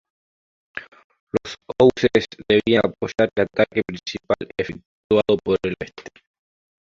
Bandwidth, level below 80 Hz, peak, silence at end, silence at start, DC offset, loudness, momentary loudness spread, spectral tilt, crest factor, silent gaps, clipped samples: 7.6 kHz; -52 dBFS; -2 dBFS; 0.75 s; 0.75 s; under 0.1%; -21 LUFS; 19 LU; -6 dB/octave; 20 dB; 1.04-1.10 s, 1.20-1.27 s, 4.86-5.10 s; under 0.1%